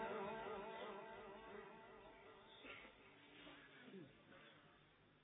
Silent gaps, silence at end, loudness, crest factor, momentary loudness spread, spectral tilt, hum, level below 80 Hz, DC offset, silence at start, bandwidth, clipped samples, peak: none; 0 s; -56 LUFS; 18 dB; 15 LU; -1 dB/octave; none; -80 dBFS; under 0.1%; 0 s; 3.9 kHz; under 0.1%; -38 dBFS